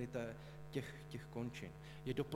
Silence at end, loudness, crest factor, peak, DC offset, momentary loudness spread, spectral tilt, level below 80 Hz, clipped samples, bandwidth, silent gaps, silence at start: 0 s; -48 LUFS; 18 dB; -28 dBFS; under 0.1%; 7 LU; -6.5 dB/octave; -64 dBFS; under 0.1%; 16.5 kHz; none; 0 s